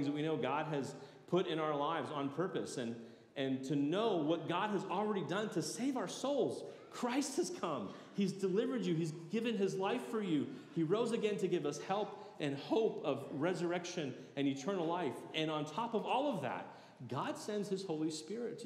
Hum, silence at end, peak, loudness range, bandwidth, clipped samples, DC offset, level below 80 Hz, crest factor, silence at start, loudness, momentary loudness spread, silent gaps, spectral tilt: none; 0 s; -22 dBFS; 2 LU; 14.5 kHz; under 0.1%; under 0.1%; under -90 dBFS; 16 dB; 0 s; -38 LUFS; 7 LU; none; -5.5 dB/octave